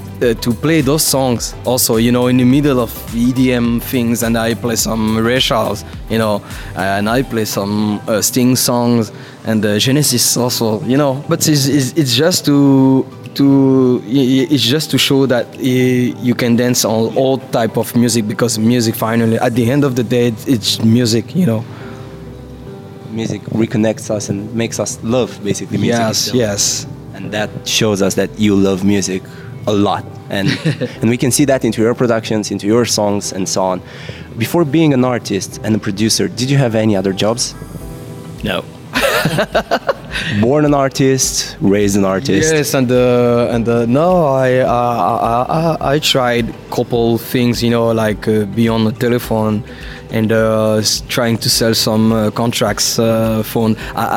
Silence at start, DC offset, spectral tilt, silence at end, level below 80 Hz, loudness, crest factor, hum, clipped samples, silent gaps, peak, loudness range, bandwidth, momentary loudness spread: 0 s; under 0.1%; -4.5 dB/octave; 0 s; -38 dBFS; -14 LUFS; 12 dB; none; under 0.1%; none; -2 dBFS; 4 LU; 17 kHz; 9 LU